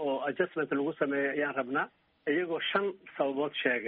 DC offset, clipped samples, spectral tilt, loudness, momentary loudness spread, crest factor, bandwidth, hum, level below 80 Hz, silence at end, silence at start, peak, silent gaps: under 0.1%; under 0.1%; -2.5 dB/octave; -32 LUFS; 4 LU; 18 dB; 4.5 kHz; none; -78 dBFS; 0 s; 0 s; -14 dBFS; none